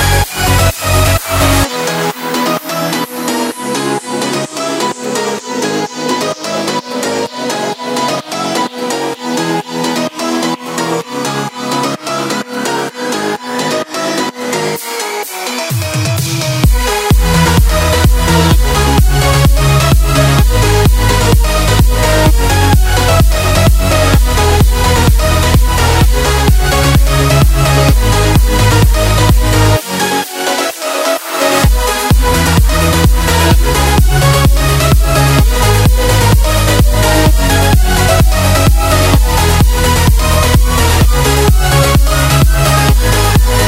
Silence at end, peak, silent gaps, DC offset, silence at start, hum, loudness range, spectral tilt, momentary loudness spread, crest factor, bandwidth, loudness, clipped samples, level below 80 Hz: 0 s; 0 dBFS; none; under 0.1%; 0 s; none; 6 LU; -4.5 dB/octave; 7 LU; 10 dB; 16.5 kHz; -11 LUFS; under 0.1%; -14 dBFS